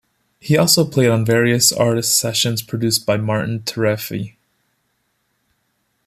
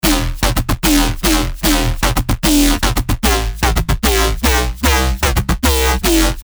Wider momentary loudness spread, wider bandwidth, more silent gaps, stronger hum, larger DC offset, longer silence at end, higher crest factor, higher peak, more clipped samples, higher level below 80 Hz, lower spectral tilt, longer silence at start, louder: first, 10 LU vs 3 LU; second, 15 kHz vs over 20 kHz; neither; neither; neither; first, 1.8 s vs 0 s; first, 18 dB vs 12 dB; about the same, 0 dBFS vs -2 dBFS; neither; second, -56 dBFS vs -18 dBFS; about the same, -4 dB/octave vs -4 dB/octave; first, 0.45 s vs 0.05 s; about the same, -16 LUFS vs -15 LUFS